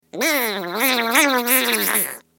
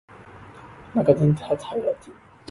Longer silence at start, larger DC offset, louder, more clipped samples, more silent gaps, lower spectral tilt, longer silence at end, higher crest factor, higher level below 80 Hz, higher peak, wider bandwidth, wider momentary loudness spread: about the same, 0.15 s vs 0.2 s; neither; first, -17 LUFS vs -23 LUFS; neither; neither; second, -1 dB/octave vs -9 dB/octave; second, 0.2 s vs 0.4 s; about the same, 20 dB vs 22 dB; second, -78 dBFS vs -54 dBFS; first, 0 dBFS vs -4 dBFS; first, 17 kHz vs 11.5 kHz; second, 5 LU vs 25 LU